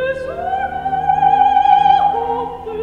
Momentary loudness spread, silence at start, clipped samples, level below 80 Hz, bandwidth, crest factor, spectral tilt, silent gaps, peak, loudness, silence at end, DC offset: 11 LU; 0 s; under 0.1%; -42 dBFS; 6.8 kHz; 14 dB; -5.5 dB/octave; none; -2 dBFS; -15 LUFS; 0 s; under 0.1%